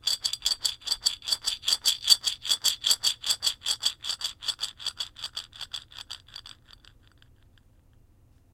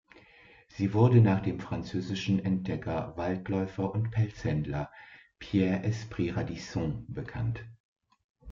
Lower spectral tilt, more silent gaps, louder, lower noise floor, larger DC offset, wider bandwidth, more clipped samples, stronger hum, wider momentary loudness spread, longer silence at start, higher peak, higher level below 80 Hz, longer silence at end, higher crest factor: second, 2.5 dB/octave vs -8 dB/octave; second, none vs 7.80-7.96 s, 8.24-8.35 s; first, -26 LUFS vs -30 LUFS; about the same, -59 dBFS vs -57 dBFS; neither; first, 17 kHz vs 7.4 kHz; neither; neither; first, 17 LU vs 13 LU; second, 0.05 s vs 0.75 s; first, -2 dBFS vs -10 dBFS; second, -60 dBFS vs -54 dBFS; first, 2.05 s vs 0 s; first, 28 dB vs 20 dB